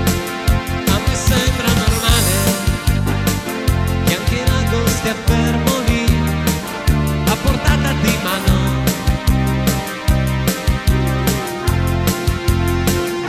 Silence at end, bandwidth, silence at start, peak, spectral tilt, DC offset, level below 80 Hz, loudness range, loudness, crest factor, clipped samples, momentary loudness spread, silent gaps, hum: 0 s; 16.5 kHz; 0 s; -2 dBFS; -5 dB/octave; under 0.1%; -22 dBFS; 1 LU; -17 LUFS; 12 dB; under 0.1%; 3 LU; none; none